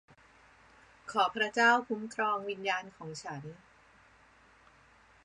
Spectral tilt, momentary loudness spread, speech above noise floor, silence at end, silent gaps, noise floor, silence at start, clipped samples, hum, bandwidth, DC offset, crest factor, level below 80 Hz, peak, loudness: -3.5 dB/octave; 19 LU; 30 dB; 1.7 s; none; -62 dBFS; 1.05 s; under 0.1%; none; 11 kHz; under 0.1%; 22 dB; -72 dBFS; -12 dBFS; -31 LUFS